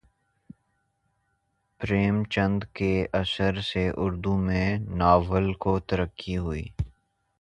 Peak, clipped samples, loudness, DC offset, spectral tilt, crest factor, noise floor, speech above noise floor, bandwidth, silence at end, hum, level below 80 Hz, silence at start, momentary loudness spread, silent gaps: -6 dBFS; under 0.1%; -26 LUFS; under 0.1%; -7.5 dB/octave; 22 dB; -74 dBFS; 49 dB; 9 kHz; 0.5 s; none; -40 dBFS; 1.8 s; 11 LU; none